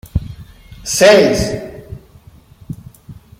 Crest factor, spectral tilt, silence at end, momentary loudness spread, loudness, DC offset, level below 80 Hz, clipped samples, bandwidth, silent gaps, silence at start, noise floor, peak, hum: 16 dB; -4 dB/octave; 0.25 s; 26 LU; -12 LUFS; under 0.1%; -34 dBFS; under 0.1%; 16.5 kHz; none; 0.15 s; -43 dBFS; 0 dBFS; none